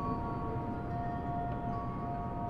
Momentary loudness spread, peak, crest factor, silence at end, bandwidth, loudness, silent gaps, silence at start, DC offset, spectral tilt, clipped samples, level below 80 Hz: 1 LU; -24 dBFS; 12 dB; 0 s; 6.6 kHz; -37 LUFS; none; 0 s; under 0.1%; -10 dB/octave; under 0.1%; -46 dBFS